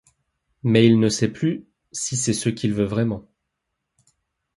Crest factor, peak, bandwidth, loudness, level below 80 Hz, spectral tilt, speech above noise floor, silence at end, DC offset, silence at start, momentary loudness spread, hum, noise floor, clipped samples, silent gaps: 20 dB; -2 dBFS; 11.5 kHz; -21 LUFS; -54 dBFS; -5.5 dB/octave; 59 dB; 1.35 s; under 0.1%; 0.65 s; 14 LU; none; -79 dBFS; under 0.1%; none